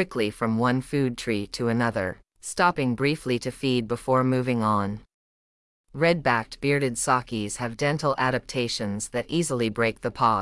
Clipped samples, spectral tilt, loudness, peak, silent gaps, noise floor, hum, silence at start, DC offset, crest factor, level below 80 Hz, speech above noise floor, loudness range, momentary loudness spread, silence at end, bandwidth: under 0.1%; -5 dB/octave; -25 LUFS; -8 dBFS; 5.14-5.84 s; under -90 dBFS; none; 0 s; under 0.1%; 18 dB; -52 dBFS; over 65 dB; 1 LU; 7 LU; 0 s; 12 kHz